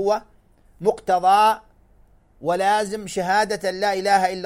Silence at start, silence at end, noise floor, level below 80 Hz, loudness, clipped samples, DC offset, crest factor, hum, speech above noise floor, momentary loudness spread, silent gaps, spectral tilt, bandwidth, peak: 0 s; 0 s; -54 dBFS; -54 dBFS; -21 LUFS; under 0.1%; under 0.1%; 16 dB; none; 34 dB; 10 LU; none; -3.5 dB/octave; 16 kHz; -6 dBFS